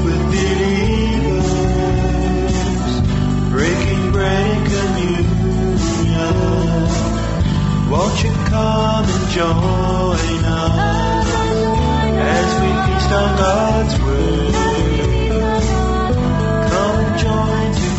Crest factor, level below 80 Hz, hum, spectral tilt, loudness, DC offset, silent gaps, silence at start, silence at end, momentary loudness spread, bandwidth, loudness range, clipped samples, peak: 12 dB; -22 dBFS; none; -6 dB/octave; -16 LUFS; under 0.1%; none; 0 s; 0 s; 2 LU; 8.2 kHz; 1 LU; under 0.1%; -2 dBFS